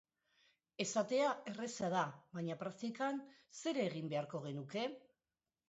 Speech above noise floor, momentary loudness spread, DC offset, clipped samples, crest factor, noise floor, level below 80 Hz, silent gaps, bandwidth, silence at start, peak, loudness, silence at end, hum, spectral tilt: over 49 dB; 9 LU; under 0.1%; under 0.1%; 18 dB; under -90 dBFS; -84 dBFS; none; 8 kHz; 0.8 s; -24 dBFS; -41 LUFS; 0.7 s; none; -4.5 dB/octave